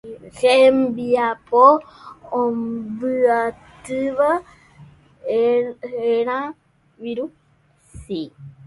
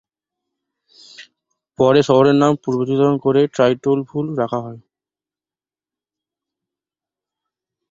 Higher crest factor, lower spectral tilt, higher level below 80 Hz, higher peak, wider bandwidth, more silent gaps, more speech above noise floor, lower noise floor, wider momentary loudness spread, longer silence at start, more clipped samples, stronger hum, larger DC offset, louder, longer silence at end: about the same, 20 dB vs 18 dB; second, -5.5 dB/octave vs -7 dB/octave; about the same, -56 dBFS vs -58 dBFS; about the same, 0 dBFS vs -2 dBFS; first, 11.5 kHz vs 7.6 kHz; neither; second, 39 dB vs over 74 dB; second, -58 dBFS vs under -90 dBFS; first, 17 LU vs 10 LU; second, 0.05 s vs 1.2 s; neither; neither; neither; second, -19 LUFS vs -16 LUFS; second, 0.15 s vs 3.1 s